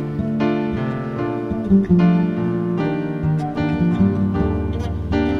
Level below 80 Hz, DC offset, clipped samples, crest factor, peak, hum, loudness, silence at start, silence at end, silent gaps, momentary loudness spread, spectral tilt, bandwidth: -34 dBFS; under 0.1%; under 0.1%; 14 dB; -4 dBFS; none; -20 LUFS; 0 s; 0 s; none; 8 LU; -9.5 dB/octave; 6.2 kHz